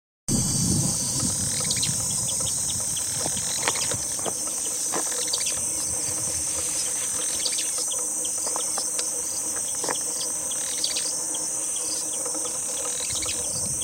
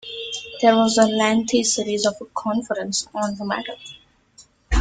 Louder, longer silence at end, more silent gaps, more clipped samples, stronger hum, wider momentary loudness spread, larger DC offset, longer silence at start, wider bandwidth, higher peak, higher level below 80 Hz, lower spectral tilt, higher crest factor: second, -24 LUFS vs -21 LUFS; about the same, 0 s vs 0 s; neither; neither; neither; second, 3 LU vs 13 LU; neither; first, 0.3 s vs 0.05 s; first, 16 kHz vs 9.6 kHz; about the same, -4 dBFS vs -2 dBFS; second, -52 dBFS vs -36 dBFS; second, -1.5 dB/octave vs -3.5 dB/octave; about the same, 22 dB vs 20 dB